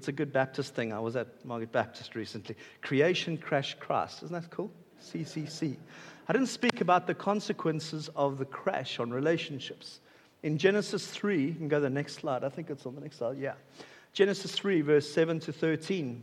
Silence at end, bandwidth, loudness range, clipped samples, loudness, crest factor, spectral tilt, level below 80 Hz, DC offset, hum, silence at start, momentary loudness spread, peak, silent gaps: 0 s; 13.5 kHz; 3 LU; under 0.1%; -32 LUFS; 24 dB; -5.5 dB/octave; -80 dBFS; under 0.1%; none; 0 s; 14 LU; -6 dBFS; none